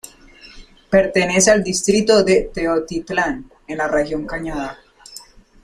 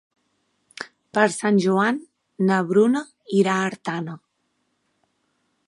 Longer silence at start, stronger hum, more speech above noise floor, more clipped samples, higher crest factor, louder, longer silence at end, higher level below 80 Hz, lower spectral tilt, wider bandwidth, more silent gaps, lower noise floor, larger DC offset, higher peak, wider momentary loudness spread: second, 0.45 s vs 0.8 s; neither; second, 27 dB vs 52 dB; neither; about the same, 18 dB vs 22 dB; first, -17 LUFS vs -21 LUFS; second, 0.4 s vs 1.5 s; first, -40 dBFS vs -74 dBFS; second, -3.5 dB/octave vs -6 dB/octave; first, 15.5 kHz vs 11.5 kHz; neither; second, -44 dBFS vs -72 dBFS; neither; about the same, -2 dBFS vs -2 dBFS; about the same, 17 LU vs 18 LU